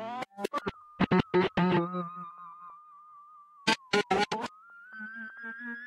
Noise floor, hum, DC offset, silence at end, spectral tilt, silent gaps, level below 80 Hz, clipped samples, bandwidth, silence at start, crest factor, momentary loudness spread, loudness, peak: -54 dBFS; none; under 0.1%; 0 s; -5.5 dB/octave; none; -60 dBFS; under 0.1%; 13.5 kHz; 0 s; 20 dB; 20 LU; -31 LUFS; -12 dBFS